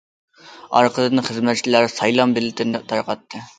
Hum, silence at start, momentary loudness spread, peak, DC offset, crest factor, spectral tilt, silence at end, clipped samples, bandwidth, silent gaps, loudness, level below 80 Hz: none; 0.45 s; 7 LU; 0 dBFS; under 0.1%; 20 dB; -4.5 dB/octave; 0.15 s; under 0.1%; 9.4 kHz; none; -19 LUFS; -64 dBFS